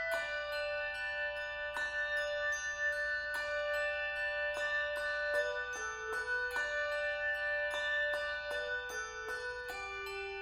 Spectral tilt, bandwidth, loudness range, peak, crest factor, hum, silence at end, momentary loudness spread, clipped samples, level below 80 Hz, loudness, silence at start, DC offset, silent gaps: -1 dB/octave; 16 kHz; 1 LU; -24 dBFS; 14 dB; none; 0 s; 6 LU; under 0.1%; -62 dBFS; -36 LUFS; 0 s; under 0.1%; none